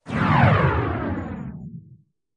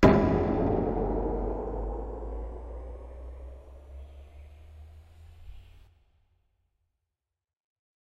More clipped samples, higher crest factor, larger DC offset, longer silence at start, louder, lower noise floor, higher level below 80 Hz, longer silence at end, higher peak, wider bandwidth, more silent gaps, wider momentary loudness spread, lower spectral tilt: neither; second, 18 dB vs 26 dB; neither; about the same, 0.05 s vs 0 s; first, -20 LUFS vs -30 LUFS; second, -52 dBFS vs -87 dBFS; about the same, -40 dBFS vs -38 dBFS; second, 0.4 s vs 2.25 s; about the same, -4 dBFS vs -6 dBFS; about the same, 8.4 kHz vs 7.8 kHz; neither; second, 20 LU vs 25 LU; about the same, -8.5 dB/octave vs -8.5 dB/octave